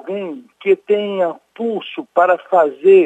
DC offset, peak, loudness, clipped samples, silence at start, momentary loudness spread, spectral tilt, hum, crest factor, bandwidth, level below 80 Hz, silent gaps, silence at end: under 0.1%; -2 dBFS; -17 LUFS; under 0.1%; 0.05 s; 12 LU; -7 dB/octave; none; 14 dB; 3.9 kHz; -76 dBFS; none; 0 s